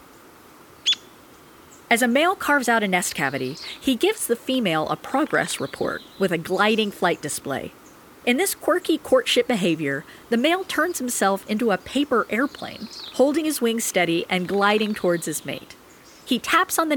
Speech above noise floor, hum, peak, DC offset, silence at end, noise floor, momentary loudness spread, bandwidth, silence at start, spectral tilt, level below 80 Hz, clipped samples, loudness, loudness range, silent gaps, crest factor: 26 dB; none; -4 dBFS; under 0.1%; 0 s; -48 dBFS; 9 LU; over 20 kHz; 0.85 s; -3.5 dB/octave; -60 dBFS; under 0.1%; -22 LUFS; 2 LU; none; 20 dB